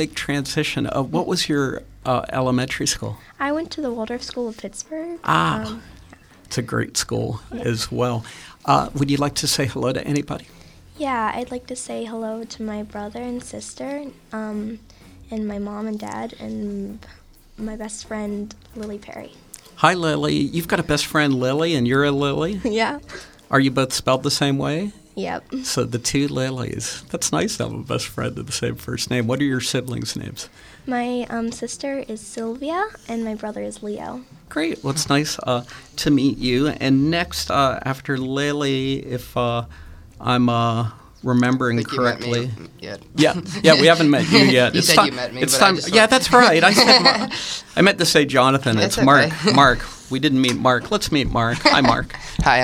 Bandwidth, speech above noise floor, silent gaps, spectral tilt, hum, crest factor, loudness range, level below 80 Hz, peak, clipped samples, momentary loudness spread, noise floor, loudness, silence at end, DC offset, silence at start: 17 kHz; 26 dB; none; -4 dB/octave; none; 20 dB; 16 LU; -44 dBFS; 0 dBFS; under 0.1%; 17 LU; -46 dBFS; -20 LUFS; 0 s; under 0.1%; 0 s